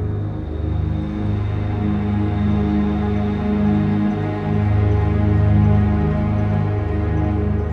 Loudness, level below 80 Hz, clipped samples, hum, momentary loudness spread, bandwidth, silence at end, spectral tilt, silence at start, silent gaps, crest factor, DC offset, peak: -19 LUFS; -26 dBFS; under 0.1%; 50 Hz at -45 dBFS; 7 LU; 4.8 kHz; 0 s; -10.5 dB/octave; 0 s; none; 12 dB; under 0.1%; -6 dBFS